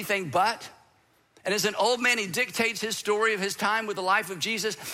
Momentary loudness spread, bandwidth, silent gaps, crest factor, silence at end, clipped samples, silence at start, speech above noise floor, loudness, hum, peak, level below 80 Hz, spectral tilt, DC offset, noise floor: 6 LU; 16 kHz; none; 16 dB; 0 s; under 0.1%; 0 s; 37 dB; -26 LUFS; none; -10 dBFS; -72 dBFS; -2.5 dB/octave; under 0.1%; -64 dBFS